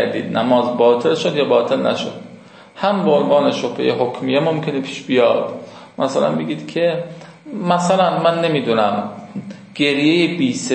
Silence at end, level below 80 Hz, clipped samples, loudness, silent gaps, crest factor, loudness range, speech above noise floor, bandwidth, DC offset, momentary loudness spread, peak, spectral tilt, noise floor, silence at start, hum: 0 s; -66 dBFS; under 0.1%; -17 LUFS; none; 16 dB; 2 LU; 24 dB; 8.8 kHz; under 0.1%; 14 LU; -2 dBFS; -5.5 dB/octave; -41 dBFS; 0 s; none